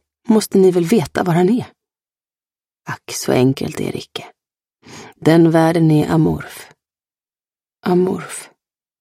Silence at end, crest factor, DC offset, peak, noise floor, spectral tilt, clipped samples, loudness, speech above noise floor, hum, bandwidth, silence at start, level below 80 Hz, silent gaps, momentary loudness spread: 0.55 s; 16 dB; under 0.1%; 0 dBFS; under -90 dBFS; -6.5 dB/octave; under 0.1%; -16 LUFS; over 75 dB; none; 15.5 kHz; 0.3 s; -50 dBFS; none; 18 LU